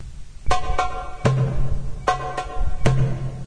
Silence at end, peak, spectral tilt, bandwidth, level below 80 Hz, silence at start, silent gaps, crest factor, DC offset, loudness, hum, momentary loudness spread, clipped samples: 0 s; -2 dBFS; -6 dB/octave; 10 kHz; -28 dBFS; 0 s; none; 18 dB; under 0.1%; -24 LUFS; none; 8 LU; under 0.1%